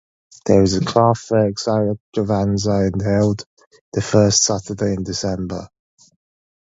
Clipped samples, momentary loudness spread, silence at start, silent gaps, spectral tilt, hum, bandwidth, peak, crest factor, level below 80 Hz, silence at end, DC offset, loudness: under 0.1%; 11 LU; 0.45 s; 2.00-2.12 s, 3.46-3.57 s, 3.67-3.71 s, 3.81-3.92 s; -5 dB/octave; none; 8 kHz; 0 dBFS; 18 dB; -42 dBFS; 1 s; under 0.1%; -18 LUFS